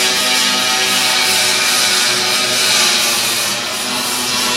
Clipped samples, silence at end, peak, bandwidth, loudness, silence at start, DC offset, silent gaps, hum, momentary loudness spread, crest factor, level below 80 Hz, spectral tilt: under 0.1%; 0 s; 0 dBFS; 16 kHz; -12 LUFS; 0 s; under 0.1%; none; none; 6 LU; 14 dB; -54 dBFS; 0.5 dB/octave